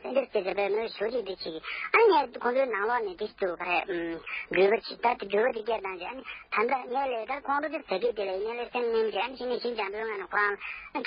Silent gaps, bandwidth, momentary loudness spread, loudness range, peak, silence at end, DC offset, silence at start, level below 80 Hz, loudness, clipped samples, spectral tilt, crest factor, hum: none; 5.4 kHz; 10 LU; 3 LU; -8 dBFS; 0 s; under 0.1%; 0 s; -64 dBFS; -29 LUFS; under 0.1%; -8 dB/octave; 20 dB; none